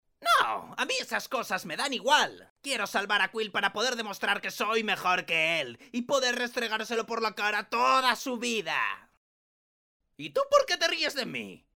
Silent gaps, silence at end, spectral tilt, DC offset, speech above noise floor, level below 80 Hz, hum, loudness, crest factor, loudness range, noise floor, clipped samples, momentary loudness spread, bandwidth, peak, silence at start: 2.50-2.56 s, 9.17-10.00 s; 0.2 s; -1.5 dB/octave; under 0.1%; over 61 dB; -72 dBFS; none; -28 LUFS; 20 dB; 2 LU; under -90 dBFS; under 0.1%; 8 LU; 19 kHz; -8 dBFS; 0.2 s